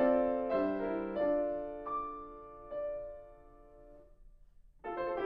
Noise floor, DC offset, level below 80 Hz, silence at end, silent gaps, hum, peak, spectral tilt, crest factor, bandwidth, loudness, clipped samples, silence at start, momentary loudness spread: -59 dBFS; under 0.1%; -60 dBFS; 0 s; none; none; -18 dBFS; -9 dB/octave; 18 dB; 5 kHz; -36 LUFS; under 0.1%; 0 s; 17 LU